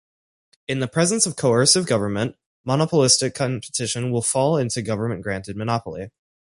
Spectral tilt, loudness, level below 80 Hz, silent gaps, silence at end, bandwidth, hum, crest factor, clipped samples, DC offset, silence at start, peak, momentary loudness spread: -4 dB/octave; -21 LUFS; -54 dBFS; 2.46-2.64 s; 0.5 s; 11.5 kHz; none; 20 dB; under 0.1%; under 0.1%; 0.7 s; -2 dBFS; 13 LU